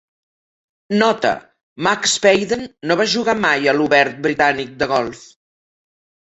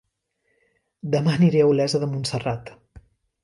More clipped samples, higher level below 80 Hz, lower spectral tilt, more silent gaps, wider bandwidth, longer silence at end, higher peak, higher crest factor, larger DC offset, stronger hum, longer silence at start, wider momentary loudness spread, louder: neither; about the same, -56 dBFS vs -56 dBFS; second, -3 dB/octave vs -6.5 dB/octave; first, 1.63-1.76 s vs none; second, 8.2 kHz vs 11.5 kHz; first, 0.95 s vs 0.45 s; first, -2 dBFS vs -6 dBFS; about the same, 18 dB vs 18 dB; neither; neither; second, 0.9 s vs 1.05 s; second, 8 LU vs 13 LU; first, -17 LUFS vs -21 LUFS